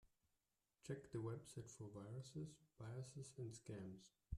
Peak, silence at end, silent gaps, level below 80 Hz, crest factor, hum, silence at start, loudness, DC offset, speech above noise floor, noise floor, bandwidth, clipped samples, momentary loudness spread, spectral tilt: -36 dBFS; 0 s; none; -72 dBFS; 18 dB; none; 0.05 s; -55 LUFS; under 0.1%; 36 dB; -90 dBFS; 13.5 kHz; under 0.1%; 8 LU; -6.5 dB/octave